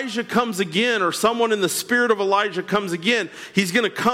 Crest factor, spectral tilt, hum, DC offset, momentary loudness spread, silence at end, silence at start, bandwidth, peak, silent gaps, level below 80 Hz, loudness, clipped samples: 16 dB; -3.5 dB/octave; none; under 0.1%; 4 LU; 0 s; 0 s; 16.5 kHz; -6 dBFS; none; -62 dBFS; -20 LUFS; under 0.1%